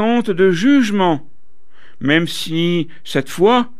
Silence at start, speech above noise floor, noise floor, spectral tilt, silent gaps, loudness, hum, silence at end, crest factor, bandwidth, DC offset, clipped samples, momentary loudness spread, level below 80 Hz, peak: 0 s; 40 dB; -55 dBFS; -5.5 dB/octave; none; -16 LUFS; none; 0.1 s; 14 dB; 14.5 kHz; 4%; under 0.1%; 8 LU; -58 dBFS; -2 dBFS